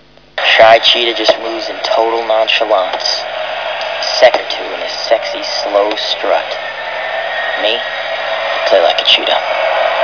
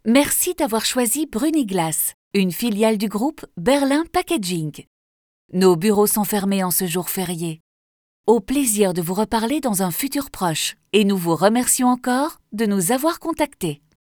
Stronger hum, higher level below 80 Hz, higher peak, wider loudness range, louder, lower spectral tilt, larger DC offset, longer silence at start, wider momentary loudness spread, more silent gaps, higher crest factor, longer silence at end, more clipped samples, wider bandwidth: neither; about the same, -52 dBFS vs -52 dBFS; about the same, 0 dBFS vs -2 dBFS; first, 5 LU vs 2 LU; first, -12 LUFS vs -20 LUFS; second, -1 dB/octave vs -4 dB/octave; first, 0.4% vs under 0.1%; first, 0.35 s vs 0.05 s; first, 11 LU vs 8 LU; second, none vs 2.14-2.31 s, 4.87-5.49 s, 7.60-8.24 s; about the same, 14 dB vs 18 dB; second, 0 s vs 0.35 s; first, 0.5% vs under 0.1%; second, 5.4 kHz vs over 20 kHz